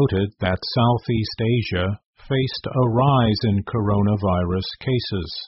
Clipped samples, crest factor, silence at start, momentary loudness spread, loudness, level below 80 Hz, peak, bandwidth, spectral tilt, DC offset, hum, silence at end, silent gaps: under 0.1%; 16 dB; 0 s; 7 LU; -21 LUFS; -42 dBFS; -6 dBFS; 5.8 kHz; -6 dB/octave; under 0.1%; none; 0 s; 2.05-2.13 s